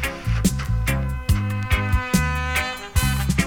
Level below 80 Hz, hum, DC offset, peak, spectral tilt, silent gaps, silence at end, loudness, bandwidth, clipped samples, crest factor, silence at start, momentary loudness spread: -26 dBFS; none; under 0.1%; -4 dBFS; -5 dB/octave; none; 0 s; -22 LUFS; 19 kHz; under 0.1%; 18 dB; 0 s; 3 LU